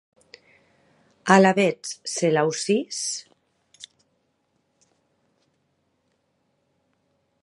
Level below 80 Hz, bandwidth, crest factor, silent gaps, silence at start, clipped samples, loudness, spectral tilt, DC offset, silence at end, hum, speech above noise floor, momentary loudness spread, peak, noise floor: -76 dBFS; 11.5 kHz; 26 dB; none; 1.25 s; under 0.1%; -22 LUFS; -4.5 dB/octave; under 0.1%; 3.6 s; none; 50 dB; 15 LU; 0 dBFS; -71 dBFS